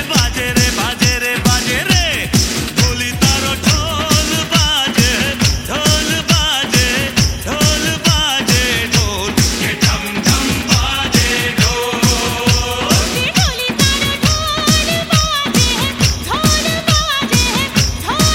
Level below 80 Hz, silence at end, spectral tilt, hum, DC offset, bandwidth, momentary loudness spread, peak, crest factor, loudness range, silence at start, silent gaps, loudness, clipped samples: -26 dBFS; 0 s; -3 dB/octave; none; under 0.1%; 17 kHz; 2 LU; 0 dBFS; 14 dB; 1 LU; 0 s; none; -13 LUFS; under 0.1%